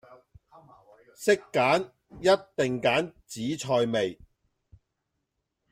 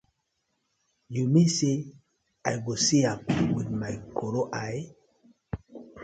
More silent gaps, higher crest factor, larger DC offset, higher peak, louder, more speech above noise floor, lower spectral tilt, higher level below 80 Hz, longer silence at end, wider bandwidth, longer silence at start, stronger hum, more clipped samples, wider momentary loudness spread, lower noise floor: neither; about the same, 20 dB vs 18 dB; neither; about the same, -10 dBFS vs -10 dBFS; about the same, -27 LUFS vs -27 LUFS; first, 55 dB vs 51 dB; about the same, -4.5 dB/octave vs -5 dB/octave; second, -64 dBFS vs -56 dBFS; first, 1.6 s vs 0 s; first, 16 kHz vs 9.2 kHz; second, 0.1 s vs 1.1 s; neither; neither; second, 9 LU vs 18 LU; about the same, -81 dBFS vs -78 dBFS